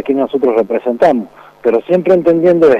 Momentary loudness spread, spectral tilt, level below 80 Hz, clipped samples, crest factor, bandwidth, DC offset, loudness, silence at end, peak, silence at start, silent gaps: 8 LU; -8 dB/octave; -52 dBFS; under 0.1%; 10 dB; 7.8 kHz; under 0.1%; -12 LUFS; 0 s; -2 dBFS; 0.05 s; none